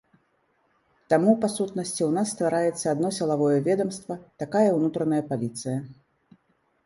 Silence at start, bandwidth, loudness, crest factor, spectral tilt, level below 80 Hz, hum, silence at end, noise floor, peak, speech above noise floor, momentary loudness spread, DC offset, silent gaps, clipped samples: 1.1 s; 11.5 kHz; -25 LUFS; 20 dB; -6 dB/octave; -68 dBFS; none; 0.9 s; -69 dBFS; -6 dBFS; 44 dB; 10 LU; under 0.1%; none; under 0.1%